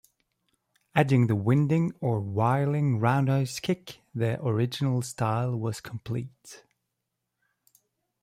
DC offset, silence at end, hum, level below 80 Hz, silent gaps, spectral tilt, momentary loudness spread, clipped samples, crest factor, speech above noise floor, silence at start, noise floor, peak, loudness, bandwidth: under 0.1%; 1.65 s; none; -64 dBFS; none; -7 dB/octave; 11 LU; under 0.1%; 18 dB; 57 dB; 0.95 s; -83 dBFS; -10 dBFS; -27 LUFS; 15 kHz